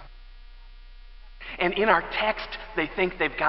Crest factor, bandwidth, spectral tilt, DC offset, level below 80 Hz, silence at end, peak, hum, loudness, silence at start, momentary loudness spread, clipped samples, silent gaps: 24 dB; 5.8 kHz; -8.5 dB/octave; 0.1%; -46 dBFS; 0 s; -4 dBFS; none; -25 LUFS; 0 s; 12 LU; under 0.1%; none